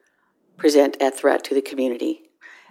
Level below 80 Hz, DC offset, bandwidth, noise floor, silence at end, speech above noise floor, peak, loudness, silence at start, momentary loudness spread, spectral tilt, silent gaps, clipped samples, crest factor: -70 dBFS; under 0.1%; 16.5 kHz; -65 dBFS; 0.55 s; 45 dB; -2 dBFS; -20 LUFS; 0.6 s; 10 LU; -2.5 dB/octave; none; under 0.1%; 18 dB